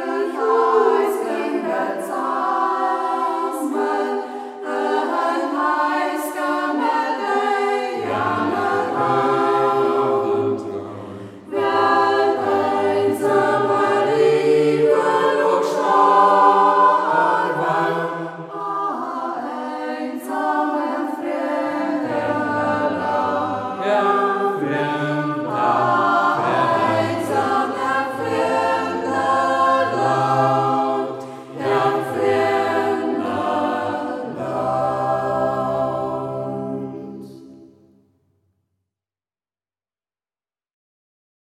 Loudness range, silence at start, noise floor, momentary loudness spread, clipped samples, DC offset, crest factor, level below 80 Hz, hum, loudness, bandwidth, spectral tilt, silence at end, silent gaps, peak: 7 LU; 0 s; under -90 dBFS; 10 LU; under 0.1%; under 0.1%; 18 dB; -64 dBFS; none; -19 LUFS; 14.5 kHz; -6 dB/octave; 3.85 s; none; -2 dBFS